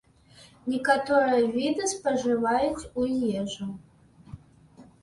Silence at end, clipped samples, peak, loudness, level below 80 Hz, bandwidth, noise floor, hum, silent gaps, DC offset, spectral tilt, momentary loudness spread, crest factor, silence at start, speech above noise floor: 0.2 s; under 0.1%; -6 dBFS; -26 LUFS; -58 dBFS; 11.5 kHz; -55 dBFS; none; none; under 0.1%; -4 dB/octave; 13 LU; 20 dB; 0.4 s; 29 dB